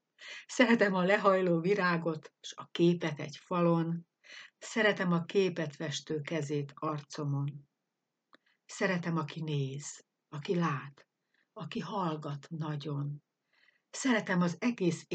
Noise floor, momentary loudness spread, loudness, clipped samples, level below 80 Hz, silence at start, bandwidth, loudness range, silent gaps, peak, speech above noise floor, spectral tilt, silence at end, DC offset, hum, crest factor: -86 dBFS; 19 LU; -32 LUFS; under 0.1%; -86 dBFS; 0.2 s; 9 kHz; 8 LU; none; -10 dBFS; 54 dB; -6 dB/octave; 0 s; under 0.1%; none; 22 dB